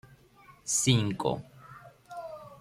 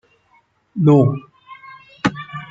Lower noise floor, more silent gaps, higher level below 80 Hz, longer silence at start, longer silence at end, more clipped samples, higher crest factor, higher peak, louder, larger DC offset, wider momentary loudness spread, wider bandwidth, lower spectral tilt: about the same, -57 dBFS vs -58 dBFS; neither; second, -62 dBFS vs -56 dBFS; second, 0.5 s vs 0.75 s; about the same, 0.05 s vs 0.05 s; neither; about the same, 20 dB vs 18 dB; second, -12 dBFS vs -2 dBFS; second, -28 LUFS vs -17 LUFS; neither; about the same, 25 LU vs 23 LU; first, 15.5 kHz vs 7.6 kHz; second, -4 dB/octave vs -8.5 dB/octave